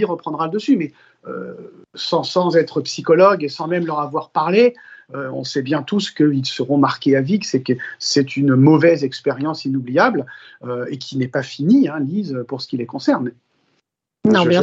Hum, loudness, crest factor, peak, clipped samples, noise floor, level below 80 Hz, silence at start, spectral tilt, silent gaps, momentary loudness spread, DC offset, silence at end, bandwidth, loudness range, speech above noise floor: none; -18 LUFS; 18 dB; 0 dBFS; under 0.1%; -70 dBFS; -66 dBFS; 0 s; -6 dB/octave; none; 14 LU; under 0.1%; 0 s; 7.8 kHz; 4 LU; 52 dB